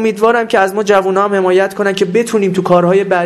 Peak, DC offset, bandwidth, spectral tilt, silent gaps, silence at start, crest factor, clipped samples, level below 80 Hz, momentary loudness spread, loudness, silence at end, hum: 0 dBFS; under 0.1%; 14 kHz; -5.5 dB/octave; none; 0 s; 12 dB; under 0.1%; -56 dBFS; 3 LU; -12 LUFS; 0 s; none